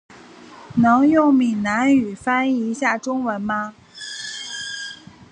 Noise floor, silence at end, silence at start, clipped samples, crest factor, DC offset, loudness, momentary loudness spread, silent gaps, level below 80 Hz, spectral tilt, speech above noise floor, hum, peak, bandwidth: -43 dBFS; 0.1 s; 0.1 s; under 0.1%; 16 dB; under 0.1%; -19 LUFS; 17 LU; none; -56 dBFS; -5 dB/octave; 25 dB; none; -4 dBFS; 10 kHz